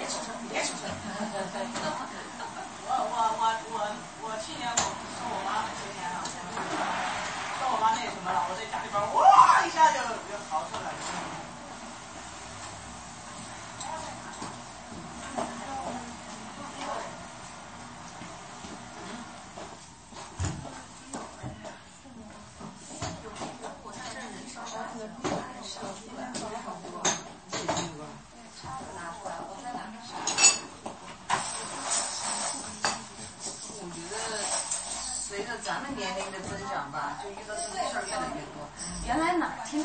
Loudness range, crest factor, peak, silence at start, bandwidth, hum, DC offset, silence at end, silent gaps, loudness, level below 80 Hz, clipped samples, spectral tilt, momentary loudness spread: 16 LU; 26 dB; -6 dBFS; 0 s; 8.8 kHz; none; under 0.1%; 0 s; none; -30 LUFS; -58 dBFS; under 0.1%; -2 dB/octave; 15 LU